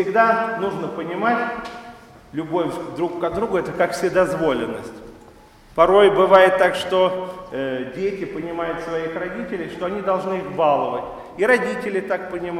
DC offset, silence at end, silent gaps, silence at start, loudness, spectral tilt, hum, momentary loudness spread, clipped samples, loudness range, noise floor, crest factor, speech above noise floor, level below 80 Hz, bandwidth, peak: under 0.1%; 0 s; none; 0 s; -20 LUFS; -5.5 dB/octave; none; 15 LU; under 0.1%; 7 LU; -47 dBFS; 20 dB; 27 dB; -50 dBFS; 14 kHz; 0 dBFS